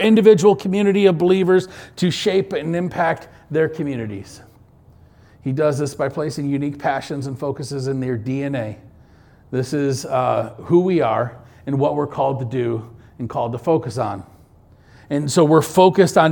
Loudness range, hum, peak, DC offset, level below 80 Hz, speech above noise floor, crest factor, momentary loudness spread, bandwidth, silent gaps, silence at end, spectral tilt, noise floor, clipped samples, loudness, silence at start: 6 LU; none; 0 dBFS; under 0.1%; -54 dBFS; 31 dB; 18 dB; 13 LU; 19 kHz; none; 0 s; -6.5 dB/octave; -49 dBFS; under 0.1%; -19 LUFS; 0 s